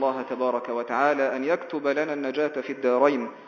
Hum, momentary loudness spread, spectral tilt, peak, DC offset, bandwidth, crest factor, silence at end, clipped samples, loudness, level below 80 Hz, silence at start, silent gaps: none; 6 LU; -5.5 dB/octave; -6 dBFS; under 0.1%; 7 kHz; 20 dB; 0 s; under 0.1%; -25 LUFS; -82 dBFS; 0 s; none